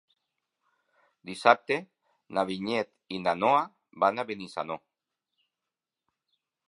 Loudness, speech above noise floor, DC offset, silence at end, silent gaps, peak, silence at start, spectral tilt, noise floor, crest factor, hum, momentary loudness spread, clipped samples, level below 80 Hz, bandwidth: -28 LUFS; 62 dB; under 0.1%; 1.9 s; none; -4 dBFS; 1.25 s; -5 dB/octave; -89 dBFS; 28 dB; none; 15 LU; under 0.1%; -74 dBFS; 11.5 kHz